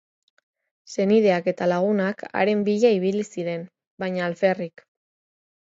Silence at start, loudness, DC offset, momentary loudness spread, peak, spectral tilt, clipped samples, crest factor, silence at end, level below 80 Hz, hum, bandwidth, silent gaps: 0.9 s; -23 LUFS; under 0.1%; 13 LU; -6 dBFS; -6.5 dB/octave; under 0.1%; 18 dB; 1 s; -72 dBFS; none; 7.8 kHz; 3.87-3.98 s